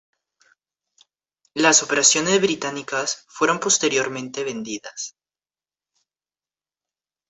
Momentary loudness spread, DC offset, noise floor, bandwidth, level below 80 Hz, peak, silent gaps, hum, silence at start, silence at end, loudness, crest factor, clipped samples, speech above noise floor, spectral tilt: 16 LU; under 0.1%; under -90 dBFS; 8.4 kHz; -68 dBFS; -2 dBFS; none; none; 1.55 s; 2.2 s; -19 LUFS; 22 dB; under 0.1%; over 69 dB; -1.5 dB/octave